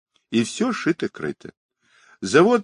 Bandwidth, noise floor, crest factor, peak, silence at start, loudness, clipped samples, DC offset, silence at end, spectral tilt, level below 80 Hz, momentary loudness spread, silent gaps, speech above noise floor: 11 kHz; -56 dBFS; 20 dB; -2 dBFS; 0.3 s; -22 LUFS; under 0.1%; under 0.1%; 0 s; -5 dB/octave; -64 dBFS; 15 LU; 1.57-1.69 s; 36 dB